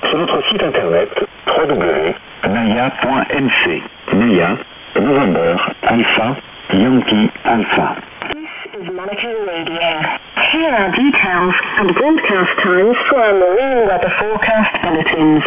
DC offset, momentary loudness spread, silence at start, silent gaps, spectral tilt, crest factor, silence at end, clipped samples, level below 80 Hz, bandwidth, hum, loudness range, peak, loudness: under 0.1%; 9 LU; 0 s; none; -9 dB/octave; 14 dB; 0 s; under 0.1%; -44 dBFS; 3.8 kHz; none; 4 LU; 0 dBFS; -14 LUFS